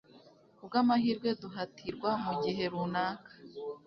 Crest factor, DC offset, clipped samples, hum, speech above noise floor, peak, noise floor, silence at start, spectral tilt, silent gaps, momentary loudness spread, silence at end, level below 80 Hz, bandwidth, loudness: 18 dB; under 0.1%; under 0.1%; none; 27 dB; -16 dBFS; -60 dBFS; 0.15 s; -7 dB/octave; none; 15 LU; 0.1 s; -70 dBFS; 6.2 kHz; -33 LUFS